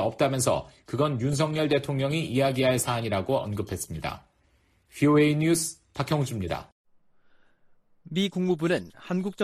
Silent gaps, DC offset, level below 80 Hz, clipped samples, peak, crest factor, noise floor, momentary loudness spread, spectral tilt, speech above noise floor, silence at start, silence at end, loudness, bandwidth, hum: 6.72-6.85 s; under 0.1%; -54 dBFS; under 0.1%; -10 dBFS; 16 dB; -65 dBFS; 11 LU; -5.5 dB/octave; 40 dB; 0 s; 0 s; -27 LUFS; 14.5 kHz; none